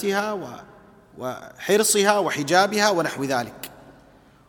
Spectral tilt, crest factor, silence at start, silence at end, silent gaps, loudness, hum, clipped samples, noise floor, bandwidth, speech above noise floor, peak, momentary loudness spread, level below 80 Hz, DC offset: -3 dB/octave; 20 dB; 0 s; 0.55 s; none; -21 LUFS; none; under 0.1%; -53 dBFS; 19 kHz; 30 dB; -2 dBFS; 19 LU; -64 dBFS; under 0.1%